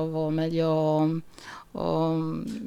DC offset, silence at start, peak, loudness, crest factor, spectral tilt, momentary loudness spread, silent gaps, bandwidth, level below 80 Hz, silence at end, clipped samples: under 0.1%; 0 s; -14 dBFS; -27 LUFS; 12 dB; -8.5 dB/octave; 15 LU; none; 11.5 kHz; -56 dBFS; 0 s; under 0.1%